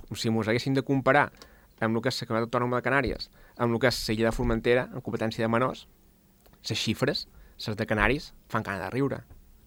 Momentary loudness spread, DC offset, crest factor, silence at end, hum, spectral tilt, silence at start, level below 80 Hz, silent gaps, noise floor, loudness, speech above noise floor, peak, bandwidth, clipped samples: 9 LU; under 0.1%; 24 dB; 0.35 s; none; -5.5 dB/octave; 0 s; -44 dBFS; none; -59 dBFS; -28 LUFS; 31 dB; -4 dBFS; 17.5 kHz; under 0.1%